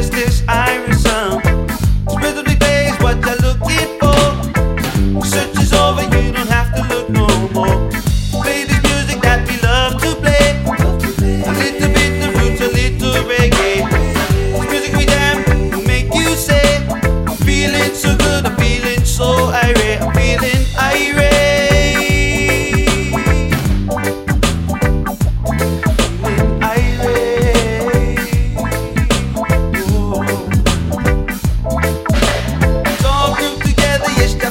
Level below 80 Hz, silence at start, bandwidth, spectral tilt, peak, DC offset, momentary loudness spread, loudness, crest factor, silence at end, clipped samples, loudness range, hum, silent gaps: -18 dBFS; 0 s; 16.5 kHz; -5 dB/octave; 0 dBFS; under 0.1%; 5 LU; -14 LUFS; 14 dB; 0 s; under 0.1%; 3 LU; none; none